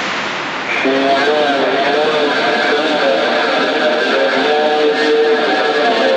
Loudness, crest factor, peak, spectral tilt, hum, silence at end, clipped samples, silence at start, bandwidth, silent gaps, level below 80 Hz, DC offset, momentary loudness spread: -13 LUFS; 10 dB; -2 dBFS; -3.5 dB/octave; none; 0 s; under 0.1%; 0 s; 9.4 kHz; none; -62 dBFS; under 0.1%; 2 LU